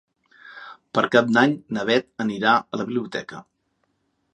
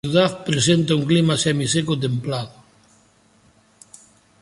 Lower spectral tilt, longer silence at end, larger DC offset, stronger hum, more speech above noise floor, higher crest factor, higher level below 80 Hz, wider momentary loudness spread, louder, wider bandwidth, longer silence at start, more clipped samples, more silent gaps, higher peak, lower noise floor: about the same, -5.5 dB/octave vs -5 dB/octave; second, 0.9 s vs 1.9 s; neither; neither; first, 50 dB vs 37 dB; about the same, 22 dB vs 18 dB; second, -68 dBFS vs -54 dBFS; first, 22 LU vs 9 LU; second, -22 LUFS vs -19 LUFS; second, 10 kHz vs 11.5 kHz; first, 0.45 s vs 0.05 s; neither; neither; about the same, -2 dBFS vs -4 dBFS; first, -71 dBFS vs -56 dBFS